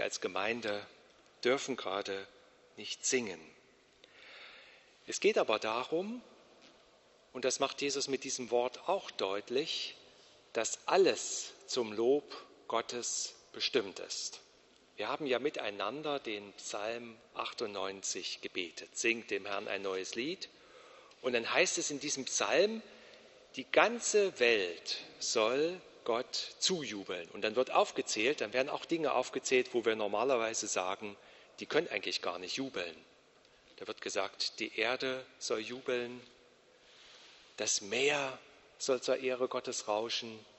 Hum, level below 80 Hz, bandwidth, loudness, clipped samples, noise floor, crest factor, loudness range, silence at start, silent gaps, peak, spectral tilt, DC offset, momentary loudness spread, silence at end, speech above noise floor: none; -80 dBFS; 8.2 kHz; -34 LUFS; under 0.1%; -65 dBFS; 26 dB; 6 LU; 0 s; none; -10 dBFS; -2 dB/octave; under 0.1%; 14 LU; 0.15 s; 30 dB